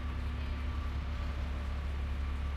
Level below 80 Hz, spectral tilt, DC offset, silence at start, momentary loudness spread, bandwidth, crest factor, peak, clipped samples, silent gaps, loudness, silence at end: -36 dBFS; -7 dB/octave; under 0.1%; 0 s; 1 LU; 7.6 kHz; 10 dB; -26 dBFS; under 0.1%; none; -38 LUFS; 0 s